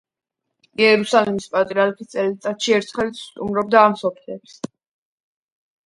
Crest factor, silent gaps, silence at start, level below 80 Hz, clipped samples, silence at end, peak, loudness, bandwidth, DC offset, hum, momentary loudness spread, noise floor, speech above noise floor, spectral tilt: 20 dB; none; 0.8 s; -60 dBFS; under 0.1%; 1.2 s; 0 dBFS; -19 LUFS; 11.5 kHz; under 0.1%; none; 20 LU; -81 dBFS; 62 dB; -4.5 dB/octave